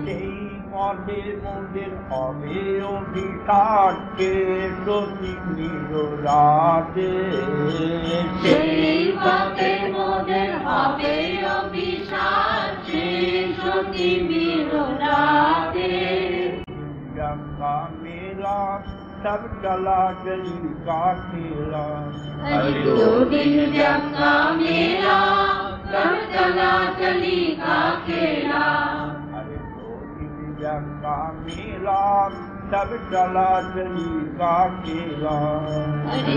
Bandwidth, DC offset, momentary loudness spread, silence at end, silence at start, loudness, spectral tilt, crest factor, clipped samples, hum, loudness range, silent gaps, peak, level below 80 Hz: 7.6 kHz; under 0.1%; 13 LU; 0 s; 0 s; -22 LUFS; -7 dB/octave; 20 dB; under 0.1%; none; 7 LU; none; -2 dBFS; -44 dBFS